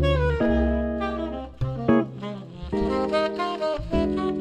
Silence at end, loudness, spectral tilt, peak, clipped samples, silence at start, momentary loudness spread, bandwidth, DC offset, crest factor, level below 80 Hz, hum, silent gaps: 0 s; -25 LUFS; -8 dB/octave; -6 dBFS; under 0.1%; 0 s; 10 LU; 9.4 kHz; under 0.1%; 18 dB; -32 dBFS; none; none